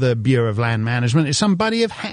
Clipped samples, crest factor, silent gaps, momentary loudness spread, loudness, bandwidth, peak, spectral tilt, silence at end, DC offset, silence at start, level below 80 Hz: under 0.1%; 14 dB; none; 3 LU; -18 LUFS; 10.5 kHz; -4 dBFS; -5.5 dB/octave; 0 s; under 0.1%; 0 s; -52 dBFS